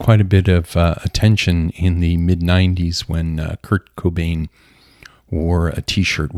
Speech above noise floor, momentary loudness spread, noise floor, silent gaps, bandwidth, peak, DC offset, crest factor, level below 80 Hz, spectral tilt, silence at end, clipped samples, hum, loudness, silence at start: 30 dB; 8 LU; -46 dBFS; none; 13.5 kHz; 0 dBFS; under 0.1%; 16 dB; -28 dBFS; -6.5 dB/octave; 0 s; under 0.1%; none; -17 LUFS; 0 s